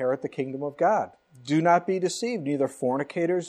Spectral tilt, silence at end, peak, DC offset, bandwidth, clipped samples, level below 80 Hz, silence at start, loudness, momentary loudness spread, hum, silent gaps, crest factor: -5.5 dB/octave; 0 s; -8 dBFS; under 0.1%; 14.5 kHz; under 0.1%; -76 dBFS; 0 s; -26 LUFS; 10 LU; none; none; 18 dB